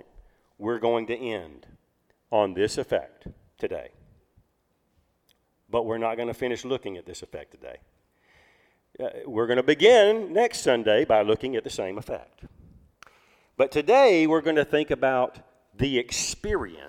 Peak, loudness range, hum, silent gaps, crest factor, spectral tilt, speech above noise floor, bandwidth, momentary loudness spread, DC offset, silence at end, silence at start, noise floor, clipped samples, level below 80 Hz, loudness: -4 dBFS; 12 LU; none; none; 22 dB; -4 dB/octave; 47 dB; 15 kHz; 19 LU; under 0.1%; 0 s; 0.6 s; -71 dBFS; under 0.1%; -52 dBFS; -24 LUFS